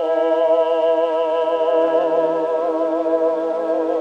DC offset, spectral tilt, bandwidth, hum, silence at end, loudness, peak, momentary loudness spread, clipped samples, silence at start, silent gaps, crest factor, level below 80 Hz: under 0.1%; -5.5 dB/octave; 6.8 kHz; none; 0 s; -18 LUFS; -6 dBFS; 4 LU; under 0.1%; 0 s; none; 12 dB; -72 dBFS